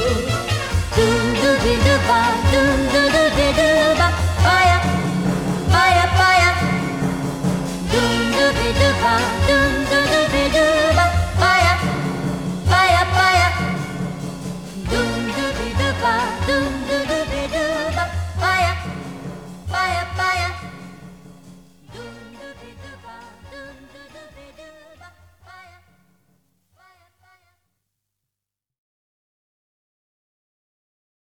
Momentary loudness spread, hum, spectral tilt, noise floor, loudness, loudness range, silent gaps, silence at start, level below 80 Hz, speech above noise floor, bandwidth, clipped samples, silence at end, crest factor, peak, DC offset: 15 LU; none; -4.5 dB/octave; -86 dBFS; -17 LUFS; 8 LU; none; 0 s; -32 dBFS; 71 dB; 16.5 kHz; under 0.1%; 5.6 s; 16 dB; -2 dBFS; 0.2%